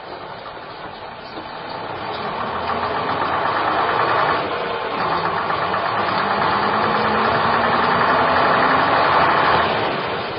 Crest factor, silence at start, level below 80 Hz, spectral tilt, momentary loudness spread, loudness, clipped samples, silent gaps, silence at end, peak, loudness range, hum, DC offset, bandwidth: 16 dB; 0 s; -48 dBFS; -9.5 dB/octave; 17 LU; -18 LUFS; under 0.1%; none; 0 s; -4 dBFS; 7 LU; none; under 0.1%; 5.6 kHz